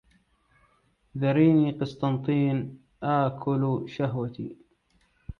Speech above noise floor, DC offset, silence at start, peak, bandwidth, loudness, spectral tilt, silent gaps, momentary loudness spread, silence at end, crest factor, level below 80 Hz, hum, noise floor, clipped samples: 42 dB; under 0.1%; 1.15 s; -10 dBFS; 6.4 kHz; -26 LUFS; -9.5 dB/octave; none; 16 LU; 0.05 s; 18 dB; -56 dBFS; none; -67 dBFS; under 0.1%